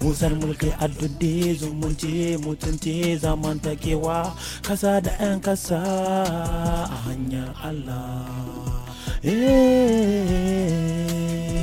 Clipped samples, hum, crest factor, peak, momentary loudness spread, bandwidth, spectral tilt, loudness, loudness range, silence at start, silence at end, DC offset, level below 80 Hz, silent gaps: under 0.1%; none; 16 dB; -6 dBFS; 12 LU; 16.5 kHz; -6 dB/octave; -24 LUFS; 5 LU; 0 s; 0 s; under 0.1%; -32 dBFS; none